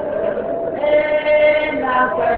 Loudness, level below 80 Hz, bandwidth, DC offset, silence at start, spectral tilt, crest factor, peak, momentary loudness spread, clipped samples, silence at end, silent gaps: -17 LUFS; -46 dBFS; 4.5 kHz; under 0.1%; 0 s; -8 dB/octave; 12 dB; -4 dBFS; 8 LU; under 0.1%; 0 s; none